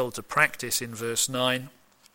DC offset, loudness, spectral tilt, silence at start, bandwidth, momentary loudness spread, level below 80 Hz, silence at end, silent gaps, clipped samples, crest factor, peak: under 0.1%; -26 LUFS; -2 dB/octave; 0 s; 17 kHz; 5 LU; -62 dBFS; 0.45 s; none; under 0.1%; 22 dB; -6 dBFS